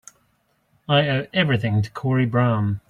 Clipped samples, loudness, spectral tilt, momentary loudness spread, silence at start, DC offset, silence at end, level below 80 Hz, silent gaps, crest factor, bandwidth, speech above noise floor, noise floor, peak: under 0.1%; -21 LUFS; -7 dB/octave; 4 LU; 0.9 s; under 0.1%; 0.1 s; -56 dBFS; none; 16 dB; 9.4 kHz; 46 dB; -66 dBFS; -4 dBFS